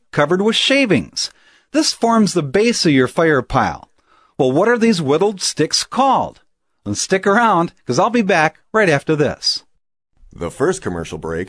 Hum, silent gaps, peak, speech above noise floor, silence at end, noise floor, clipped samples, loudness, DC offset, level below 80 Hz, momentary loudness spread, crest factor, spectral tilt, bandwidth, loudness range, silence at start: none; none; 0 dBFS; 39 dB; 0 s; -55 dBFS; under 0.1%; -16 LUFS; under 0.1%; -46 dBFS; 11 LU; 16 dB; -4 dB/octave; 11 kHz; 2 LU; 0.15 s